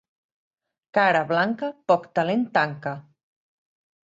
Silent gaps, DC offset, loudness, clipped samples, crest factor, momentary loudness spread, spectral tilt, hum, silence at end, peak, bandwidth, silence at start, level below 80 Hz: none; under 0.1%; -23 LUFS; under 0.1%; 20 dB; 12 LU; -6.5 dB/octave; none; 1.05 s; -6 dBFS; 7.8 kHz; 0.95 s; -72 dBFS